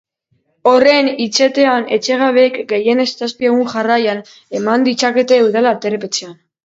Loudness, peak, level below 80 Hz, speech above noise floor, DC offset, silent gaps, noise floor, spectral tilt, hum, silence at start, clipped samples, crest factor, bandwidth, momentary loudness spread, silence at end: -14 LUFS; 0 dBFS; -64 dBFS; 50 dB; under 0.1%; none; -63 dBFS; -3.5 dB/octave; none; 0.65 s; under 0.1%; 14 dB; 8 kHz; 8 LU; 0.35 s